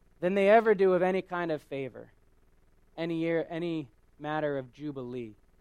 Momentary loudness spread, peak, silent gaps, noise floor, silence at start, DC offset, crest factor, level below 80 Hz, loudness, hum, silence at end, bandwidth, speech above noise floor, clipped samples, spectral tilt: 19 LU; -10 dBFS; none; -62 dBFS; 0.2 s; under 0.1%; 20 dB; -64 dBFS; -29 LUFS; none; 0.3 s; 10.5 kHz; 34 dB; under 0.1%; -7.5 dB/octave